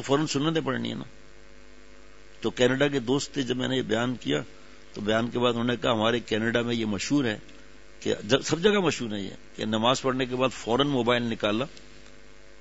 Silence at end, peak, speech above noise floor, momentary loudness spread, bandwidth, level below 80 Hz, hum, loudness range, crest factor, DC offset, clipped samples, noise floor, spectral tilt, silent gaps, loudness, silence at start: 0.5 s; -6 dBFS; 26 dB; 11 LU; 8 kHz; -56 dBFS; none; 3 LU; 20 dB; 0.5%; under 0.1%; -52 dBFS; -4.5 dB/octave; none; -26 LUFS; 0 s